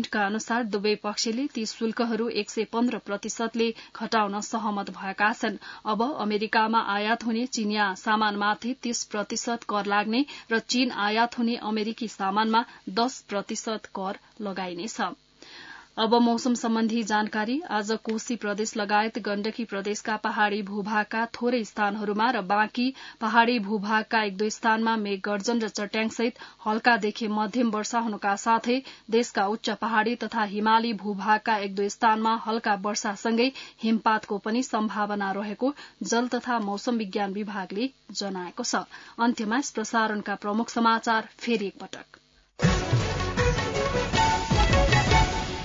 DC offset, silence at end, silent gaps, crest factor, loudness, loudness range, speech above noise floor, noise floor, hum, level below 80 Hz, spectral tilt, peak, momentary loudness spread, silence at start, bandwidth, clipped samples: under 0.1%; 0 s; none; 20 dB; -26 LUFS; 4 LU; 20 dB; -46 dBFS; none; -42 dBFS; -4.5 dB/octave; -6 dBFS; 9 LU; 0 s; 7.8 kHz; under 0.1%